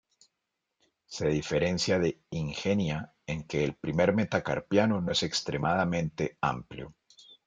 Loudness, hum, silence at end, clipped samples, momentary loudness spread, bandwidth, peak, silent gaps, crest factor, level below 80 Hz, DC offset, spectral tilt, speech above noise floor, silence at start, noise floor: -29 LUFS; none; 0.55 s; under 0.1%; 11 LU; 9.4 kHz; -10 dBFS; none; 20 dB; -56 dBFS; under 0.1%; -5.5 dB/octave; 55 dB; 1.1 s; -84 dBFS